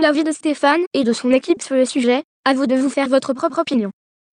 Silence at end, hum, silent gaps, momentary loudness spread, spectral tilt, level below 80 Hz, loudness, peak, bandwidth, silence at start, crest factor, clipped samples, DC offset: 0.4 s; none; 0.87-0.91 s, 2.24-2.43 s; 4 LU; -4 dB/octave; -64 dBFS; -18 LUFS; -4 dBFS; 10.5 kHz; 0 s; 14 dB; under 0.1%; under 0.1%